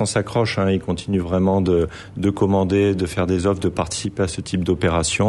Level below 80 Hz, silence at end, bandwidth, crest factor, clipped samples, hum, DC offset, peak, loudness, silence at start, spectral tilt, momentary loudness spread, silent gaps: -40 dBFS; 0 s; 11.5 kHz; 14 dB; under 0.1%; none; under 0.1%; -6 dBFS; -20 LUFS; 0 s; -5.5 dB/octave; 6 LU; none